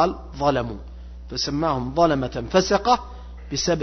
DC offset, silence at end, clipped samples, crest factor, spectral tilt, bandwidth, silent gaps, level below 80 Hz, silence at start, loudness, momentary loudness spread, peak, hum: under 0.1%; 0 s; under 0.1%; 18 dB; -4.5 dB/octave; 6.4 kHz; none; -38 dBFS; 0 s; -23 LUFS; 19 LU; -6 dBFS; none